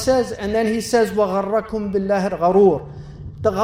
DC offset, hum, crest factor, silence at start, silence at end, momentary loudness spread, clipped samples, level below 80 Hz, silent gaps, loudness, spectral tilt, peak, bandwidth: under 0.1%; none; 16 dB; 0 s; 0 s; 11 LU; under 0.1%; -44 dBFS; none; -19 LUFS; -6 dB/octave; -4 dBFS; 16 kHz